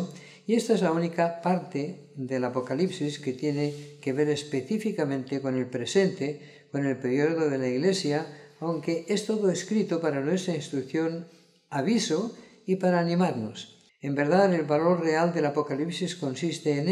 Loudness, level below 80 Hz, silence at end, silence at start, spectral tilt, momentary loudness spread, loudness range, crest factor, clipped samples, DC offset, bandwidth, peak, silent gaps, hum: -27 LUFS; -76 dBFS; 0 s; 0 s; -6 dB/octave; 10 LU; 3 LU; 18 dB; under 0.1%; under 0.1%; 12.5 kHz; -10 dBFS; none; none